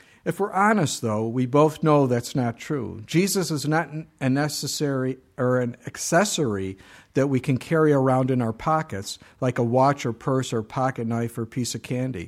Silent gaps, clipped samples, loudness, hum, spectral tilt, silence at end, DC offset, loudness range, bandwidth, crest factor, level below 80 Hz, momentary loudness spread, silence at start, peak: none; under 0.1%; -24 LUFS; none; -5.5 dB/octave; 0 s; under 0.1%; 2 LU; 15.5 kHz; 18 dB; -58 dBFS; 10 LU; 0.25 s; -6 dBFS